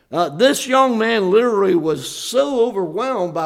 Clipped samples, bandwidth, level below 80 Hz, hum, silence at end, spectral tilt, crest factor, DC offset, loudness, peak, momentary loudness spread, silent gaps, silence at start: under 0.1%; 16 kHz; -60 dBFS; none; 0 s; -4 dB/octave; 16 dB; under 0.1%; -17 LUFS; -2 dBFS; 7 LU; none; 0.1 s